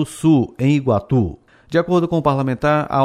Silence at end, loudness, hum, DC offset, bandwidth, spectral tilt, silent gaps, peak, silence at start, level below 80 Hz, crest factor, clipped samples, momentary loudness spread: 0 s; -18 LUFS; none; under 0.1%; 13 kHz; -7.5 dB/octave; none; -4 dBFS; 0 s; -44 dBFS; 14 dB; under 0.1%; 4 LU